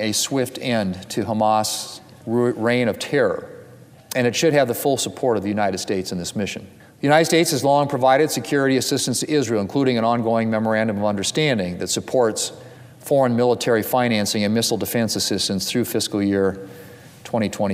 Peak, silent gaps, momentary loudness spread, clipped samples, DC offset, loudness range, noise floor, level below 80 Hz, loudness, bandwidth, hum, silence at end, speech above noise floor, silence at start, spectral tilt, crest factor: -4 dBFS; none; 9 LU; under 0.1%; under 0.1%; 3 LU; -45 dBFS; -60 dBFS; -20 LUFS; 16 kHz; none; 0 s; 25 dB; 0 s; -4 dB/octave; 18 dB